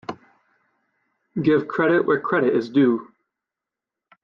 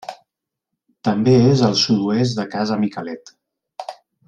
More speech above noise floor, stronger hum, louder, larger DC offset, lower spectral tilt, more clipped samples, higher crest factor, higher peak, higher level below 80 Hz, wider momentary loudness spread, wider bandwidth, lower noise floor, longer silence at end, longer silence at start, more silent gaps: first, 68 dB vs 64 dB; neither; second, -20 LUFS vs -17 LUFS; neither; first, -8.5 dB/octave vs -6 dB/octave; neither; about the same, 16 dB vs 16 dB; second, -6 dBFS vs -2 dBFS; second, -68 dBFS vs -54 dBFS; second, 9 LU vs 21 LU; second, 6.8 kHz vs 9.6 kHz; first, -87 dBFS vs -81 dBFS; first, 1.2 s vs 0.35 s; about the same, 0.1 s vs 0.1 s; neither